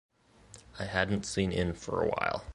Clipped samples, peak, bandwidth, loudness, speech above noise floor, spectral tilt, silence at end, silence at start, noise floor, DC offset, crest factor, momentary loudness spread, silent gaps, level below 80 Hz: under 0.1%; -12 dBFS; 11.5 kHz; -32 LUFS; 25 dB; -5 dB/octave; 0 s; 0.5 s; -56 dBFS; under 0.1%; 22 dB; 6 LU; none; -50 dBFS